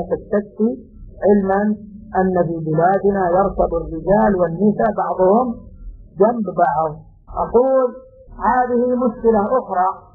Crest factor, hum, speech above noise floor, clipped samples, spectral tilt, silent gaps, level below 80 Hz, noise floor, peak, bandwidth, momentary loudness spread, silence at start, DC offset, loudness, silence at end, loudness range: 16 dB; none; 19 dB; under 0.1%; -12 dB/octave; none; -40 dBFS; -36 dBFS; -2 dBFS; 2 kHz; 9 LU; 0 s; under 0.1%; -18 LUFS; 0.15 s; 2 LU